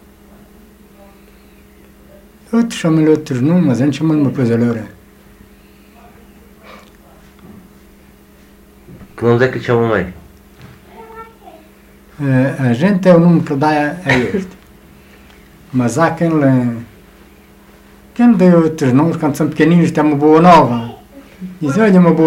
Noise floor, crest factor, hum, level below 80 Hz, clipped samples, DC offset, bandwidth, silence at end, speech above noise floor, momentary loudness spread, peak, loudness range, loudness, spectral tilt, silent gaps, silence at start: -43 dBFS; 14 dB; none; -46 dBFS; under 0.1%; under 0.1%; 14 kHz; 0 s; 32 dB; 15 LU; 0 dBFS; 8 LU; -13 LUFS; -7.5 dB/octave; none; 2.5 s